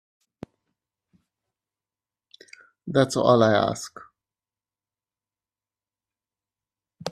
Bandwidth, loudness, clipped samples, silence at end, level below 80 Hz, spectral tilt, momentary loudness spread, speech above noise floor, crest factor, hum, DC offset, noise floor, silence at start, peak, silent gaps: 13.5 kHz; -21 LUFS; under 0.1%; 0 s; -66 dBFS; -5.5 dB/octave; 20 LU; over 69 dB; 24 dB; none; under 0.1%; under -90 dBFS; 2.85 s; -4 dBFS; none